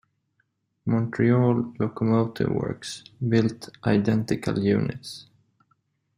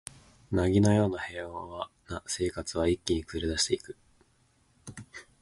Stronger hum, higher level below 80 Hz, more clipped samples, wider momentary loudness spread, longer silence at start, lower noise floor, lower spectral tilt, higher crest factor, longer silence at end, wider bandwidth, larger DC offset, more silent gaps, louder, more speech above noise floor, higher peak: neither; second, -56 dBFS vs -46 dBFS; neither; second, 13 LU vs 23 LU; first, 0.85 s vs 0.5 s; first, -72 dBFS vs -67 dBFS; first, -7.5 dB/octave vs -5 dB/octave; about the same, 18 dB vs 20 dB; first, 0.95 s vs 0.2 s; first, 14.5 kHz vs 11.5 kHz; neither; neither; first, -25 LUFS vs -30 LUFS; first, 49 dB vs 38 dB; first, -8 dBFS vs -12 dBFS